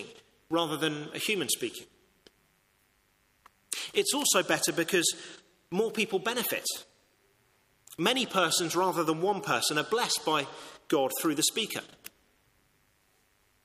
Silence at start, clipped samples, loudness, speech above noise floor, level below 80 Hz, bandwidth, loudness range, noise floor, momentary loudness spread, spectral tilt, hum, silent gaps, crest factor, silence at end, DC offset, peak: 0 s; under 0.1%; -29 LUFS; 40 dB; -74 dBFS; 15.5 kHz; 5 LU; -69 dBFS; 14 LU; -2 dB/octave; none; none; 22 dB; 1.55 s; under 0.1%; -10 dBFS